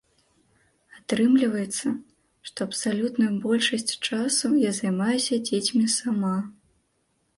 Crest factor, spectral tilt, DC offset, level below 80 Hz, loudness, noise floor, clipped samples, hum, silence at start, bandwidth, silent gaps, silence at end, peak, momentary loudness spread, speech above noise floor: 18 dB; -4 dB/octave; under 0.1%; -68 dBFS; -24 LUFS; -71 dBFS; under 0.1%; none; 0.95 s; 11.5 kHz; none; 0.85 s; -8 dBFS; 10 LU; 47 dB